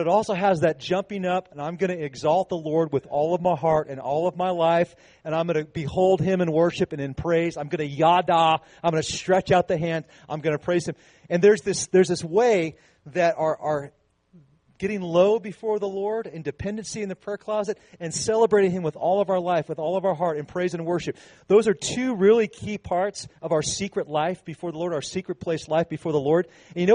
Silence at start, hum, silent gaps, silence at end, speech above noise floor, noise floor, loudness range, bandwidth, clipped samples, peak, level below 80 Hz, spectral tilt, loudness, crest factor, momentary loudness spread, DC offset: 0 s; none; none; 0 s; 33 dB; -56 dBFS; 4 LU; 10 kHz; under 0.1%; -6 dBFS; -58 dBFS; -5.5 dB/octave; -24 LUFS; 18 dB; 11 LU; under 0.1%